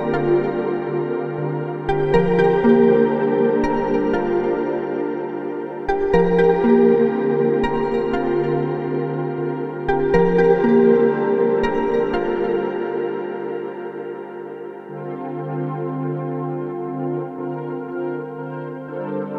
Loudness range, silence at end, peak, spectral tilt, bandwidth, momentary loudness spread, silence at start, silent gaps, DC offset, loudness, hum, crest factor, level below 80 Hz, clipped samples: 9 LU; 0 s; -2 dBFS; -9 dB/octave; 6.2 kHz; 14 LU; 0 s; none; under 0.1%; -20 LUFS; none; 16 dB; -42 dBFS; under 0.1%